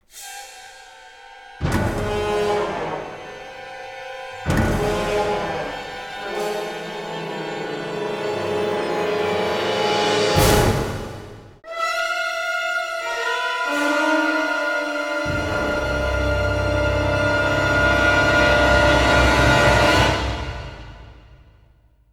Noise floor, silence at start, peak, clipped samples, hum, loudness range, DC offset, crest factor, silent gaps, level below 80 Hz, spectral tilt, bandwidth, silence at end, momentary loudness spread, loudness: -54 dBFS; 0.15 s; -2 dBFS; under 0.1%; none; 10 LU; under 0.1%; 20 dB; none; -32 dBFS; -4.5 dB/octave; 19.5 kHz; 0.75 s; 19 LU; -20 LUFS